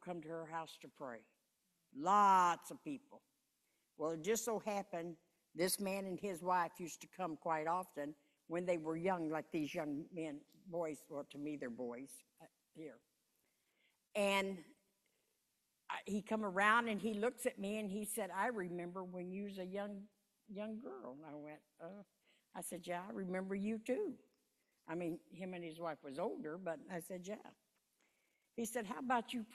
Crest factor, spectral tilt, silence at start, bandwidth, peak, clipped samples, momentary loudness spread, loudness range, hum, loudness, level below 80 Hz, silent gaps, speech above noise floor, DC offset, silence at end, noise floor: 24 dB; -4.5 dB/octave; 0 s; 14 kHz; -18 dBFS; under 0.1%; 17 LU; 10 LU; none; -41 LUFS; -84 dBFS; none; 43 dB; under 0.1%; 0 s; -85 dBFS